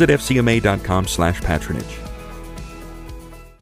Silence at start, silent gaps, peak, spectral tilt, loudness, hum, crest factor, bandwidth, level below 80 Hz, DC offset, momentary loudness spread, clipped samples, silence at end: 0 s; none; -2 dBFS; -5.5 dB/octave; -19 LUFS; none; 18 dB; 16 kHz; -32 dBFS; under 0.1%; 20 LU; under 0.1%; 0.1 s